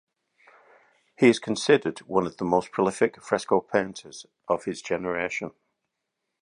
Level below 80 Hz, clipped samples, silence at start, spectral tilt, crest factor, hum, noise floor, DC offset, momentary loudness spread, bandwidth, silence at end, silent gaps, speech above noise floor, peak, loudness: -64 dBFS; under 0.1%; 1.2 s; -5 dB/octave; 22 dB; none; -82 dBFS; under 0.1%; 13 LU; 11 kHz; 0.95 s; none; 57 dB; -4 dBFS; -25 LUFS